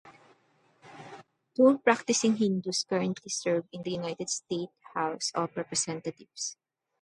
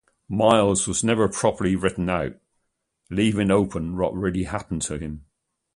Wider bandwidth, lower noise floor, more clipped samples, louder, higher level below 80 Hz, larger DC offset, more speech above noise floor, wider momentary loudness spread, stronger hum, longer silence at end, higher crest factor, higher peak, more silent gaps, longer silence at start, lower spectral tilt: about the same, 11.5 kHz vs 11.5 kHz; second, -67 dBFS vs -75 dBFS; neither; second, -29 LUFS vs -23 LUFS; second, -76 dBFS vs -44 dBFS; neither; second, 38 dB vs 53 dB; about the same, 14 LU vs 12 LU; neither; about the same, 0.5 s vs 0.55 s; about the same, 24 dB vs 20 dB; about the same, -6 dBFS vs -4 dBFS; neither; second, 0.05 s vs 0.3 s; second, -3.5 dB/octave vs -5 dB/octave